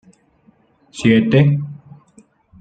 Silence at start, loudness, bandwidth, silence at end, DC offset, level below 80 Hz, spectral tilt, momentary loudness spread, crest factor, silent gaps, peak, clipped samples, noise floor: 0.95 s; -15 LUFS; 9 kHz; 0.85 s; under 0.1%; -54 dBFS; -7.5 dB/octave; 19 LU; 18 dB; none; -2 dBFS; under 0.1%; -55 dBFS